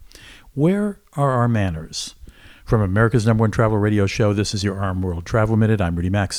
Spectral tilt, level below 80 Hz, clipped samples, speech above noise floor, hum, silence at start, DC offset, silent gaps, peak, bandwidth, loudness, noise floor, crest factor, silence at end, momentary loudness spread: -6.5 dB/octave; -38 dBFS; under 0.1%; 25 dB; none; 0 s; under 0.1%; none; -4 dBFS; 12 kHz; -20 LUFS; -44 dBFS; 16 dB; 0 s; 8 LU